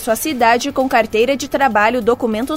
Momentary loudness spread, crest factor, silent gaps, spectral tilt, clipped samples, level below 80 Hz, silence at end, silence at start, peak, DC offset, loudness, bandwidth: 3 LU; 14 dB; none; -3.5 dB/octave; under 0.1%; -46 dBFS; 0 s; 0 s; 0 dBFS; under 0.1%; -15 LUFS; 16.5 kHz